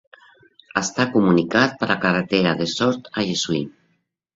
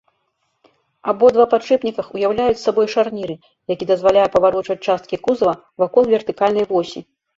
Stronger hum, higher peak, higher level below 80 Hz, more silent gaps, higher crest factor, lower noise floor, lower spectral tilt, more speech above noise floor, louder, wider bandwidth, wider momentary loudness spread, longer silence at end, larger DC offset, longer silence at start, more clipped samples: neither; about the same, -2 dBFS vs -2 dBFS; about the same, -56 dBFS vs -54 dBFS; neither; about the same, 20 dB vs 16 dB; about the same, -68 dBFS vs -69 dBFS; second, -4.5 dB/octave vs -6 dB/octave; about the same, 49 dB vs 52 dB; second, -20 LUFS vs -17 LUFS; about the same, 8 kHz vs 7.8 kHz; second, 8 LU vs 12 LU; first, 0.65 s vs 0.35 s; neither; second, 0.75 s vs 1.05 s; neither